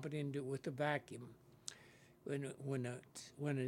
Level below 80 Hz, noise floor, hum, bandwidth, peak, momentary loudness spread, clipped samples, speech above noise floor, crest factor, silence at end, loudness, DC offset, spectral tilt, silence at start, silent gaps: -82 dBFS; -65 dBFS; none; 16 kHz; -20 dBFS; 15 LU; under 0.1%; 22 dB; 24 dB; 0 s; -45 LUFS; under 0.1%; -6 dB/octave; 0 s; none